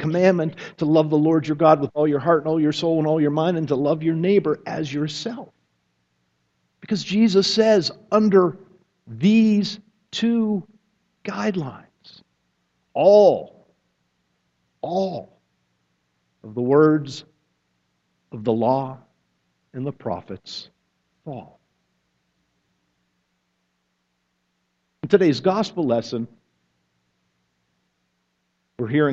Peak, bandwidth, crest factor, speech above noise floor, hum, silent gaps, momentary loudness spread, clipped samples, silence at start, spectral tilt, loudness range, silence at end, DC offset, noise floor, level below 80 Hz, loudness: 0 dBFS; 8 kHz; 22 dB; 53 dB; none; none; 18 LU; under 0.1%; 0 s; -6.5 dB/octave; 12 LU; 0 s; under 0.1%; -72 dBFS; -66 dBFS; -20 LUFS